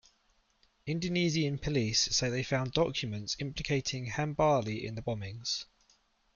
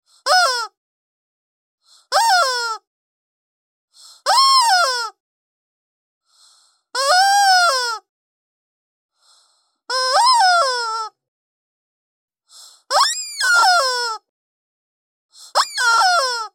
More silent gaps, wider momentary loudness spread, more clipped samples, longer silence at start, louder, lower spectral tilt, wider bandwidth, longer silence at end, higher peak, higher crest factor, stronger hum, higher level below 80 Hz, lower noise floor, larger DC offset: second, none vs 0.77-1.78 s, 2.87-3.88 s, 5.20-6.21 s, 8.09-9.09 s, 11.28-12.28 s, 14.29-15.29 s; second, 9 LU vs 13 LU; neither; first, 0.85 s vs 0.25 s; second, -32 LUFS vs -15 LUFS; first, -4 dB/octave vs 6 dB/octave; second, 7.4 kHz vs 16.5 kHz; first, 0.7 s vs 0.05 s; second, -14 dBFS vs -2 dBFS; about the same, 20 dB vs 16 dB; neither; first, -54 dBFS vs under -90 dBFS; first, -71 dBFS vs -62 dBFS; neither